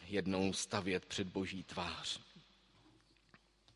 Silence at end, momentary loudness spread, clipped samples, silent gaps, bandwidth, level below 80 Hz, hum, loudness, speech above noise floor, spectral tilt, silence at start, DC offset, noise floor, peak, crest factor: 1.35 s; 6 LU; under 0.1%; none; 11.5 kHz; -64 dBFS; none; -40 LUFS; 29 dB; -4 dB/octave; 0 s; under 0.1%; -69 dBFS; -18 dBFS; 24 dB